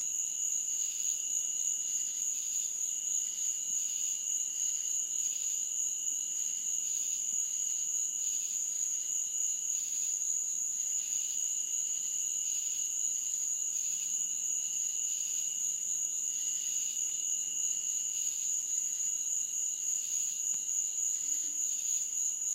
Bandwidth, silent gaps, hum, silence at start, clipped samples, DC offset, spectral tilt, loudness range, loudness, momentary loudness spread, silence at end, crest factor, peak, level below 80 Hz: 16 kHz; none; none; 0 s; under 0.1%; under 0.1%; 3.5 dB/octave; 0 LU; -31 LUFS; 1 LU; 0 s; 14 dB; -20 dBFS; -86 dBFS